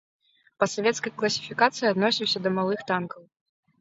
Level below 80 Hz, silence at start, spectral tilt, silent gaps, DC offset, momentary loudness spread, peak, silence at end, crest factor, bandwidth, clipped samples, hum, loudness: -70 dBFS; 0.6 s; -4 dB/octave; none; under 0.1%; 6 LU; -4 dBFS; 0.6 s; 22 dB; 8 kHz; under 0.1%; none; -25 LUFS